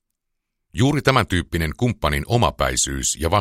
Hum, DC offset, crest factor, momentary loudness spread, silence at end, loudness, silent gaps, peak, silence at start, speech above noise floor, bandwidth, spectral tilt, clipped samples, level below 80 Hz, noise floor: none; under 0.1%; 20 dB; 5 LU; 0 s; -20 LUFS; none; -2 dBFS; 0.75 s; 58 dB; 16 kHz; -4 dB/octave; under 0.1%; -34 dBFS; -77 dBFS